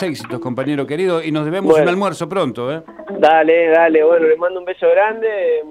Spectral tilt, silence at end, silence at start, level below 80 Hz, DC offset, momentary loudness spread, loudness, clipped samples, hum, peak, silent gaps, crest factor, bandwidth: -6 dB/octave; 0 s; 0 s; -58 dBFS; under 0.1%; 12 LU; -15 LUFS; under 0.1%; none; 0 dBFS; none; 14 dB; 11.5 kHz